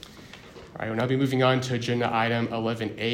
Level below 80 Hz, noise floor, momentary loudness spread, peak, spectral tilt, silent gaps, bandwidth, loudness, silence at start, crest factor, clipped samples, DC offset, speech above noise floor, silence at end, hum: -60 dBFS; -46 dBFS; 21 LU; -8 dBFS; -6 dB/octave; none; 15.5 kHz; -26 LUFS; 0 s; 18 dB; under 0.1%; under 0.1%; 21 dB; 0 s; none